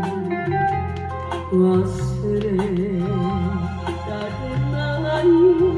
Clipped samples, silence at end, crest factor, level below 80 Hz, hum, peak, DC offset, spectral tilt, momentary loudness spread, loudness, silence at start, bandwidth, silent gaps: under 0.1%; 0 s; 14 dB; -40 dBFS; none; -6 dBFS; under 0.1%; -8 dB/octave; 11 LU; -21 LUFS; 0 s; 10 kHz; none